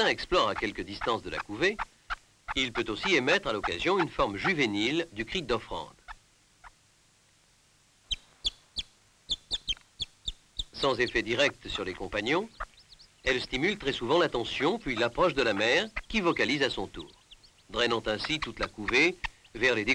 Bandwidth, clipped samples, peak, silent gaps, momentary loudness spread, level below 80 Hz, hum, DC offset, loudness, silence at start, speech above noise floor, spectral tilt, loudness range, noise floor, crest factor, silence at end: 11.5 kHz; under 0.1%; -14 dBFS; none; 13 LU; -50 dBFS; none; under 0.1%; -29 LUFS; 0 s; 35 dB; -4 dB/octave; 9 LU; -64 dBFS; 16 dB; 0 s